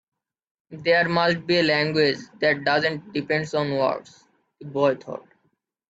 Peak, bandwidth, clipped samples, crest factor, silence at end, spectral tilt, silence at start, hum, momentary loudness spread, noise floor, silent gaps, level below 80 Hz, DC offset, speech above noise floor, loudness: -6 dBFS; 8 kHz; under 0.1%; 18 dB; 0.7 s; -5.5 dB/octave; 0.7 s; none; 12 LU; -71 dBFS; none; -66 dBFS; under 0.1%; 48 dB; -22 LUFS